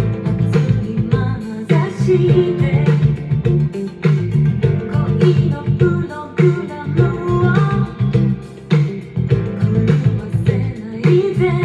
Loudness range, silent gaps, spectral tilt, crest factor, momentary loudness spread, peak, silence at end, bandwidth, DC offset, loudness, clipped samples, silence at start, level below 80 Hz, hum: 1 LU; none; -9 dB/octave; 14 dB; 6 LU; 0 dBFS; 0 s; 7.6 kHz; under 0.1%; -16 LUFS; under 0.1%; 0 s; -36 dBFS; none